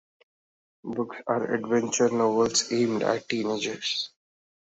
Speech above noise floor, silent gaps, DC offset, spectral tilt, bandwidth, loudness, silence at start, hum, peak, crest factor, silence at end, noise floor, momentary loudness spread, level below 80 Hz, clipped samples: over 64 dB; none; under 0.1%; -3.5 dB/octave; 8.2 kHz; -26 LUFS; 0.85 s; none; -10 dBFS; 18 dB; 0.6 s; under -90 dBFS; 10 LU; -68 dBFS; under 0.1%